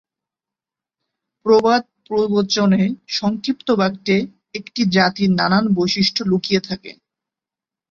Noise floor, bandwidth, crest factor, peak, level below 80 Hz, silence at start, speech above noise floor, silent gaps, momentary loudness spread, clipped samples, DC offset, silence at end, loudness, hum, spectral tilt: -89 dBFS; 7.4 kHz; 18 dB; -2 dBFS; -56 dBFS; 1.45 s; 71 dB; none; 10 LU; under 0.1%; under 0.1%; 1 s; -18 LUFS; none; -5.5 dB/octave